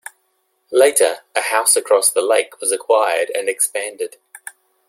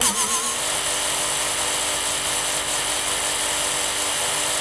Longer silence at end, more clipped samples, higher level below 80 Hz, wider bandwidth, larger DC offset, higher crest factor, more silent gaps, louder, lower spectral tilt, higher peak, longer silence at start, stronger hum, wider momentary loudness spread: first, 0.8 s vs 0 s; neither; second, -70 dBFS vs -50 dBFS; first, 16.5 kHz vs 12 kHz; neither; about the same, 18 dB vs 18 dB; neither; first, -16 LUFS vs -20 LUFS; about the same, 1 dB/octave vs 0.5 dB/octave; first, 0 dBFS vs -6 dBFS; first, 0.7 s vs 0 s; neither; first, 15 LU vs 1 LU